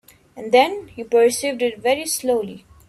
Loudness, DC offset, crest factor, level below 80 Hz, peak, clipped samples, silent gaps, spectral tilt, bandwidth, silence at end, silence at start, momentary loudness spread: -19 LUFS; under 0.1%; 18 dB; -60 dBFS; -2 dBFS; under 0.1%; none; -2.5 dB/octave; 15 kHz; 0.3 s; 0.35 s; 13 LU